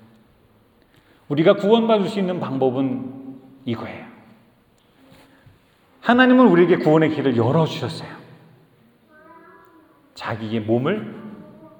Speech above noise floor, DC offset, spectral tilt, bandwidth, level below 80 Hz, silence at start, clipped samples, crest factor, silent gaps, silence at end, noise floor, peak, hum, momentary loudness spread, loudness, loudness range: 39 dB; under 0.1%; -7.5 dB/octave; 18 kHz; -66 dBFS; 1.3 s; under 0.1%; 20 dB; none; 0.1 s; -57 dBFS; -2 dBFS; none; 21 LU; -19 LUFS; 11 LU